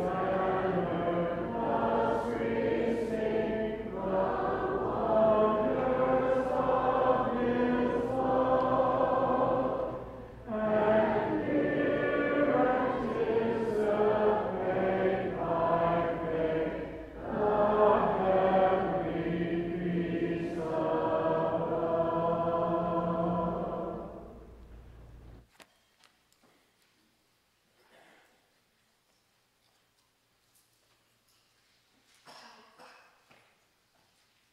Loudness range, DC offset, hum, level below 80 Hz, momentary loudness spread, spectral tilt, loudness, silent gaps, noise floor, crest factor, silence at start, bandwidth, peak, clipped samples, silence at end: 4 LU; under 0.1%; none; -54 dBFS; 7 LU; -8 dB/octave; -29 LUFS; none; -72 dBFS; 18 dB; 0 s; 10.5 kHz; -12 dBFS; under 0.1%; 1.65 s